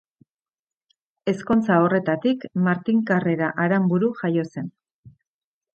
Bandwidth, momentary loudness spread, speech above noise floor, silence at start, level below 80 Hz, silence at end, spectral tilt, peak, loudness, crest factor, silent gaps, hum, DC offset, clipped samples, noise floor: 7.8 kHz; 10 LU; over 69 dB; 1.25 s; -62 dBFS; 0.65 s; -8.5 dB/octave; -4 dBFS; -22 LUFS; 18 dB; 4.91-5.04 s; none; under 0.1%; under 0.1%; under -90 dBFS